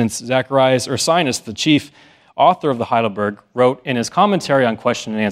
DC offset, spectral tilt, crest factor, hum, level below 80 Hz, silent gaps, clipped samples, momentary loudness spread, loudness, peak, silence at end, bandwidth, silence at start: under 0.1%; -4.5 dB/octave; 16 dB; none; -60 dBFS; none; under 0.1%; 6 LU; -17 LUFS; 0 dBFS; 0 s; 15.5 kHz; 0 s